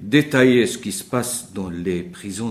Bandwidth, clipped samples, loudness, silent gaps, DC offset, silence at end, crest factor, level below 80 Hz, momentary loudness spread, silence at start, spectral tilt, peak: 15.5 kHz; under 0.1%; -20 LUFS; none; under 0.1%; 0 s; 20 dB; -54 dBFS; 13 LU; 0 s; -4.5 dB/octave; 0 dBFS